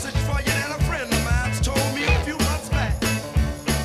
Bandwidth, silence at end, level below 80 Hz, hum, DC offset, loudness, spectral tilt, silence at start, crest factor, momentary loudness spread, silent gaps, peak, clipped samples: 15.5 kHz; 0 s; -28 dBFS; none; under 0.1%; -23 LUFS; -4.5 dB/octave; 0 s; 16 dB; 3 LU; none; -6 dBFS; under 0.1%